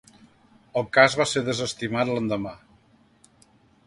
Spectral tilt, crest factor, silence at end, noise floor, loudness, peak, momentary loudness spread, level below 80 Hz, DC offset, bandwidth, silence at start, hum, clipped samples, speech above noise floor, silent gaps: -4 dB/octave; 22 dB; 1.3 s; -59 dBFS; -23 LUFS; -4 dBFS; 12 LU; -60 dBFS; under 0.1%; 11.5 kHz; 0.75 s; none; under 0.1%; 36 dB; none